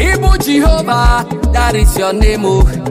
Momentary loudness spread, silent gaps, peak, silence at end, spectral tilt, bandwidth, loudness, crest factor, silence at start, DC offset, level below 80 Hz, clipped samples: 2 LU; none; 0 dBFS; 0 s; -5.5 dB/octave; 16 kHz; -12 LUFS; 10 dB; 0 s; under 0.1%; -12 dBFS; under 0.1%